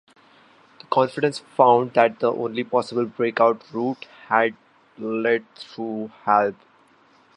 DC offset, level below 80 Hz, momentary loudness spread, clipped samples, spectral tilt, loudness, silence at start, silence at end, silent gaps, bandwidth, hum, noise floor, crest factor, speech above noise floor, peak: under 0.1%; -74 dBFS; 13 LU; under 0.1%; -6 dB/octave; -22 LUFS; 0.9 s; 0.85 s; none; 11 kHz; none; -56 dBFS; 22 dB; 35 dB; -2 dBFS